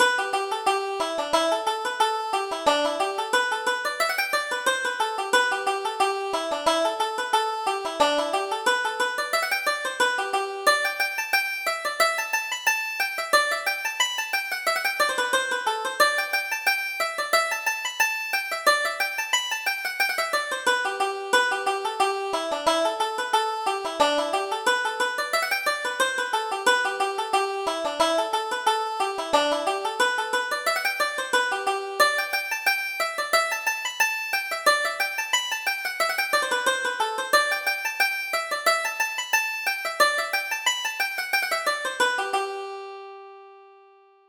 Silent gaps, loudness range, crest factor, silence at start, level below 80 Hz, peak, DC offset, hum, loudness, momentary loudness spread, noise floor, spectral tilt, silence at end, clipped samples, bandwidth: none; 1 LU; 20 dB; 0 s; -66 dBFS; -6 dBFS; under 0.1%; none; -24 LUFS; 5 LU; -55 dBFS; 0.5 dB/octave; 0.6 s; under 0.1%; over 20 kHz